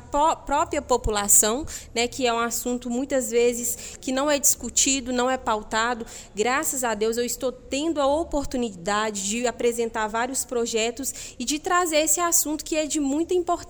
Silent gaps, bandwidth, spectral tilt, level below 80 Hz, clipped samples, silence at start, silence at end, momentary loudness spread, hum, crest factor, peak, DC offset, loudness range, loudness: none; over 20 kHz; -2 dB/octave; -44 dBFS; under 0.1%; 0 s; 0 s; 9 LU; none; 20 dB; -4 dBFS; under 0.1%; 3 LU; -23 LUFS